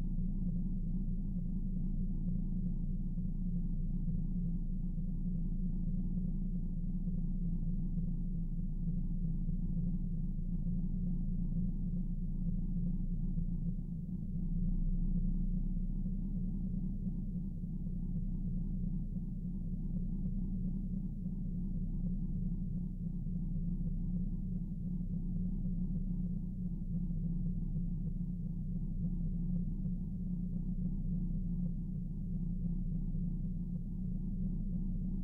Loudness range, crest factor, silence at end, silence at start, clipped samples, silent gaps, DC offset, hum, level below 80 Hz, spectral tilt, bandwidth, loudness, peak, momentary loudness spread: 1 LU; 10 dB; 0 s; 0 s; under 0.1%; none; under 0.1%; none; -38 dBFS; -13 dB/octave; 1 kHz; -40 LUFS; -26 dBFS; 3 LU